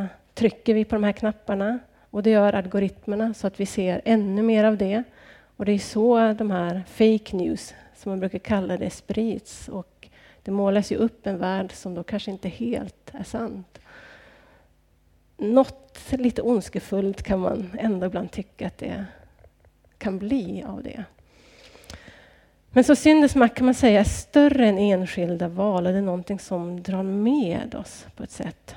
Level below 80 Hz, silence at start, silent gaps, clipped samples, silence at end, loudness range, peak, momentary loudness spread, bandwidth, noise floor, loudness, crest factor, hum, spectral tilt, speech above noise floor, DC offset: -48 dBFS; 0 s; none; under 0.1%; 0 s; 13 LU; -4 dBFS; 17 LU; 13 kHz; -60 dBFS; -23 LUFS; 20 dB; none; -6.5 dB/octave; 38 dB; under 0.1%